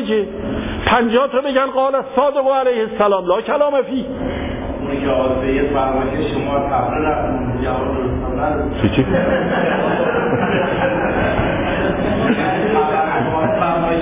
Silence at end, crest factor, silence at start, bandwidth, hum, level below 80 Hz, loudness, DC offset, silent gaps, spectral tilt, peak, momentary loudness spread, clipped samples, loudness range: 0 s; 14 dB; 0 s; 3.9 kHz; none; -32 dBFS; -17 LUFS; under 0.1%; none; -10.5 dB/octave; -2 dBFS; 5 LU; under 0.1%; 2 LU